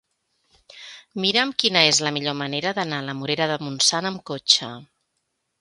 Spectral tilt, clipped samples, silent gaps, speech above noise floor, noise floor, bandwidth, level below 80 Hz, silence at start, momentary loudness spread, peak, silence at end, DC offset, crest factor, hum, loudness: -2 dB/octave; under 0.1%; none; 53 dB; -75 dBFS; 11.5 kHz; -70 dBFS; 0.75 s; 19 LU; 0 dBFS; 0.75 s; under 0.1%; 24 dB; none; -21 LUFS